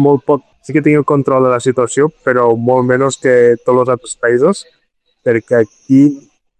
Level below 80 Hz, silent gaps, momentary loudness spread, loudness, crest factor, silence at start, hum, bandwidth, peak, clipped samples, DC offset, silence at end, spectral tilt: -54 dBFS; none; 6 LU; -12 LUFS; 12 dB; 0 s; none; 9.6 kHz; 0 dBFS; under 0.1%; under 0.1%; 0.4 s; -6.5 dB/octave